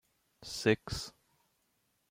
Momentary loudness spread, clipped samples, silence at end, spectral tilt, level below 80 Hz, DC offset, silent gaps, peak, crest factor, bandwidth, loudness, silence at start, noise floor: 16 LU; under 0.1%; 1 s; -4.5 dB/octave; -58 dBFS; under 0.1%; none; -14 dBFS; 24 dB; 16.5 kHz; -34 LUFS; 0.4 s; -77 dBFS